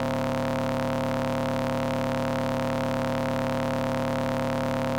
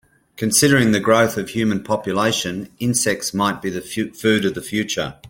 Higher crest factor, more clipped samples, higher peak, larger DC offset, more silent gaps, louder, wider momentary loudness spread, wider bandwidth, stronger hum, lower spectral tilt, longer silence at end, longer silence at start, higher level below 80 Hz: second, 12 dB vs 18 dB; neither; second, -14 dBFS vs -2 dBFS; neither; neither; second, -27 LUFS vs -19 LUFS; second, 0 LU vs 11 LU; about the same, 17 kHz vs 17 kHz; neither; first, -6.5 dB/octave vs -4 dB/octave; about the same, 0 s vs 0 s; second, 0 s vs 0.4 s; first, -46 dBFS vs -54 dBFS